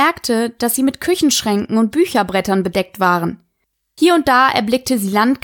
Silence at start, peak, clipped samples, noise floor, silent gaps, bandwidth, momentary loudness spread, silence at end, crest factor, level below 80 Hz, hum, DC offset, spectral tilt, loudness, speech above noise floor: 0 s; 0 dBFS; under 0.1%; -70 dBFS; none; 19.5 kHz; 6 LU; 0.05 s; 14 dB; -50 dBFS; none; under 0.1%; -4 dB/octave; -16 LUFS; 55 dB